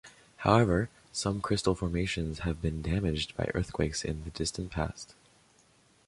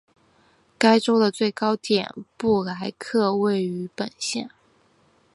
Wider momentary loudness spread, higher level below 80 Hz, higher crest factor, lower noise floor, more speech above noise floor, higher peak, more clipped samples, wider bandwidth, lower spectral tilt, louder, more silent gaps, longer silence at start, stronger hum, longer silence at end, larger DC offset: second, 10 LU vs 13 LU; first, -44 dBFS vs -64 dBFS; about the same, 24 dB vs 20 dB; about the same, -64 dBFS vs -61 dBFS; second, 34 dB vs 39 dB; second, -8 dBFS vs -4 dBFS; neither; about the same, 11.5 kHz vs 11.5 kHz; about the same, -5.5 dB/octave vs -5 dB/octave; second, -31 LUFS vs -23 LUFS; neither; second, 0.05 s vs 0.8 s; neither; first, 1.05 s vs 0.85 s; neither